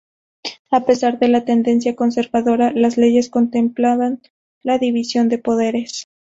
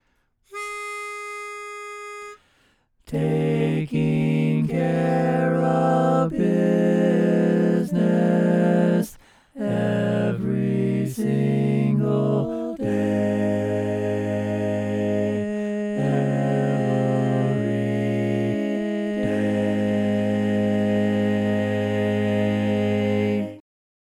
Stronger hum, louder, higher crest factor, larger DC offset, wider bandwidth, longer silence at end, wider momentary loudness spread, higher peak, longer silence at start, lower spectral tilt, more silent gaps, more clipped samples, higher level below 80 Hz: neither; first, -17 LUFS vs -22 LUFS; about the same, 14 dB vs 16 dB; neither; second, 7.8 kHz vs 14.5 kHz; second, 0.35 s vs 0.6 s; about the same, 13 LU vs 11 LU; first, -2 dBFS vs -6 dBFS; about the same, 0.45 s vs 0.5 s; second, -5 dB/octave vs -8 dB/octave; first, 0.59-0.65 s, 4.30-4.61 s vs none; neither; about the same, -58 dBFS vs -58 dBFS